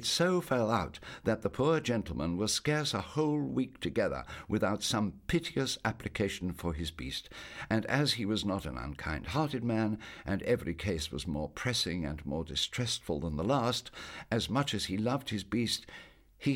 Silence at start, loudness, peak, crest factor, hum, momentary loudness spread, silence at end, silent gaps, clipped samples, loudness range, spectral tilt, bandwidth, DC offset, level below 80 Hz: 0 s; -33 LUFS; -12 dBFS; 20 dB; none; 8 LU; 0 s; none; under 0.1%; 2 LU; -4.5 dB/octave; 17.5 kHz; under 0.1%; -50 dBFS